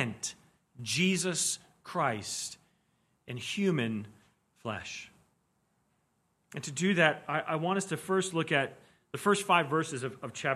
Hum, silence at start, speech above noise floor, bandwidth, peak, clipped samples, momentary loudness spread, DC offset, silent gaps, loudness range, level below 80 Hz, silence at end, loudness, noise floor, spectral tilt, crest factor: none; 0 s; 44 dB; 14.5 kHz; -8 dBFS; under 0.1%; 15 LU; under 0.1%; none; 8 LU; -74 dBFS; 0 s; -31 LUFS; -75 dBFS; -4 dB/octave; 24 dB